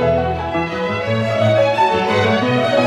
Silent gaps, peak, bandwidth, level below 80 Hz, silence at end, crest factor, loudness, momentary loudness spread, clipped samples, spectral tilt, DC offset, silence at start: none; -2 dBFS; 12 kHz; -44 dBFS; 0 s; 14 dB; -16 LUFS; 6 LU; under 0.1%; -6.5 dB/octave; under 0.1%; 0 s